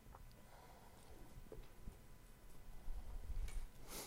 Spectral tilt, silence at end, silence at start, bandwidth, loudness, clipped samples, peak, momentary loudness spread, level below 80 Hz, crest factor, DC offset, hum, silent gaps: -4 dB/octave; 0 s; 0 s; 16 kHz; -58 LUFS; under 0.1%; -34 dBFS; 12 LU; -52 dBFS; 16 dB; under 0.1%; none; none